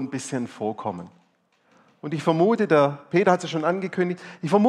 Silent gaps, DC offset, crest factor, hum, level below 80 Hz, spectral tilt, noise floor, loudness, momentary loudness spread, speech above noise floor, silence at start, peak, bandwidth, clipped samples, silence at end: none; under 0.1%; 18 dB; none; -70 dBFS; -6.5 dB/octave; -65 dBFS; -23 LUFS; 13 LU; 42 dB; 0 s; -4 dBFS; 11.5 kHz; under 0.1%; 0 s